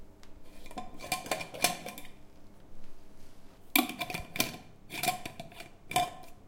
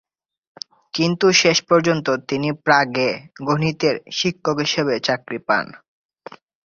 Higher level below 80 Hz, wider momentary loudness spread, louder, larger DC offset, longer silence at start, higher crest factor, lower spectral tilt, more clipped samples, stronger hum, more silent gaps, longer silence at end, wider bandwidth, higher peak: about the same, -54 dBFS vs -58 dBFS; first, 20 LU vs 12 LU; second, -33 LUFS vs -19 LUFS; neither; second, 0 s vs 0.95 s; first, 32 dB vs 20 dB; second, -2 dB/octave vs -4 dB/octave; neither; neither; neither; second, 0 s vs 0.85 s; first, 17 kHz vs 7.4 kHz; second, -6 dBFS vs -2 dBFS